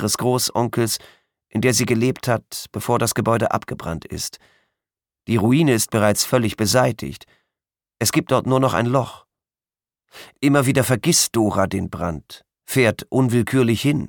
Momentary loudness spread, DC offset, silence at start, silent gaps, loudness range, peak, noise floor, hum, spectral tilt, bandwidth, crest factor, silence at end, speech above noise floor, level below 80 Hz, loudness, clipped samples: 12 LU; under 0.1%; 0 s; none; 3 LU; -4 dBFS; under -90 dBFS; none; -4.5 dB/octave; 19 kHz; 18 dB; 0 s; over 71 dB; -50 dBFS; -19 LUFS; under 0.1%